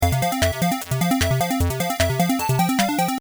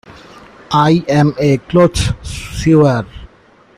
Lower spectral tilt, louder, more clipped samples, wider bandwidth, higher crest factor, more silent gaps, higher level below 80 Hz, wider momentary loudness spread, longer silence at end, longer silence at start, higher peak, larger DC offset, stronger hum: second, -5 dB/octave vs -6.5 dB/octave; second, -21 LUFS vs -13 LUFS; neither; first, over 20 kHz vs 13.5 kHz; about the same, 16 dB vs 12 dB; neither; about the same, -36 dBFS vs -32 dBFS; second, 3 LU vs 11 LU; second, 0 s vs 0.5 s; about the same, 0 s vs 0.1 s; second, -6 dBFS vs -2 dBFS; neither; neither